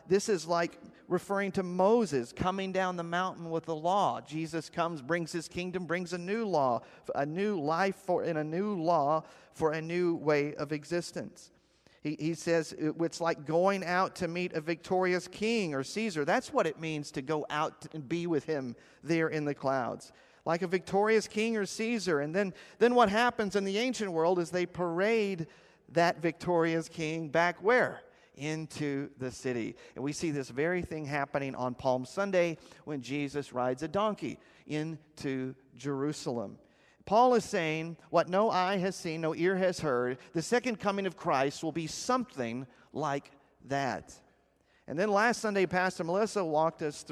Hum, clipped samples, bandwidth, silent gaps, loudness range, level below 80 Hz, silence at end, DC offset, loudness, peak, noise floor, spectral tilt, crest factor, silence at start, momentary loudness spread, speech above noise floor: none; under 0.1%; 14 kHz; none; 5 LU; -66 dBFS; 0 s; under 0.1%; -32 LUFS; -10 dBFS; -69 dBFS; -5 dB/octave; 20 dB; 0.05 s; 9 LU; 37 dB